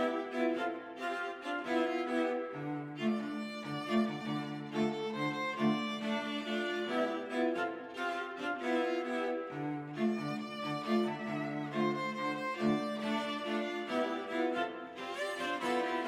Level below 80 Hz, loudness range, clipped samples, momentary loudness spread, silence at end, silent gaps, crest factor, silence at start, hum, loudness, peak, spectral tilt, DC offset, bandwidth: -78 dBFS; 1 LU; under 0.1%; 6 LU; 0 s; none; 16 dB; 0 s; none; -36 LUFS; -20 dBFS; -5.5 dB/octave; under 0.1%; 13.5 kHz